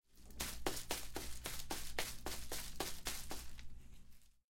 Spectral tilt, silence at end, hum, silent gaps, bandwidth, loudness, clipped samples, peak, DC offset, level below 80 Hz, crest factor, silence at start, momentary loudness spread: -2 dB/octave; 0.25 s; none; none; 17 kHz; -45 LUFS; under 0.1%; -20 dBFS; under 0.1%; -54 dBFS; 24 dB; 0.1 s; 18 LU